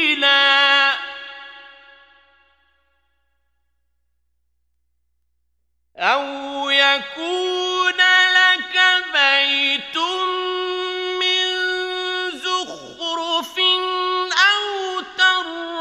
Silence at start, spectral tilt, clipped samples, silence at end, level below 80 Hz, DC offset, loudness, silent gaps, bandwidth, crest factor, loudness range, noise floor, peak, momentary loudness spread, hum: 0 s; 0 dB/octave; under 0.1%; 0 s; -66 dBFS; under 0.1%; -17 LUFS; none; 14.5 kHz; 20 dB; 9 LU; -73 dBFS; -2 dBFS; 13 LU; 60 Hz at -70 dBFS